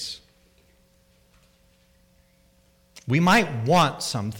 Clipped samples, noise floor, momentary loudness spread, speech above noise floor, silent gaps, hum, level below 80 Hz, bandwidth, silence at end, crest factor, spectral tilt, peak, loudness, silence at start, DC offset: under 0.1%; -61 dBFS; 20 LU; 39 dB; none; none; -54 dBFS; 18.5 kHz; 0 s; 20 dB; -5 dB/octave; -6 dBFS; -21 LUFS; 0 s; under 0.1%